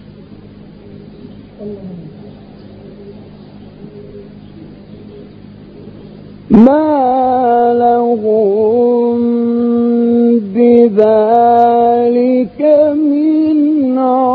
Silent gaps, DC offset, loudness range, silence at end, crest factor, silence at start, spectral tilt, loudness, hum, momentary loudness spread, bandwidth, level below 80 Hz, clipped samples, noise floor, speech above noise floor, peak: none; under 0.1%; 22 LU; 0 s; 12 dB; 0.1 s; -10.5 dB/octave; -10 LUFS; none; 20 LU; 4.9 kHz; -46 dBFS; 0.3%; -35 dBFS; 25 dB; 0 dBFS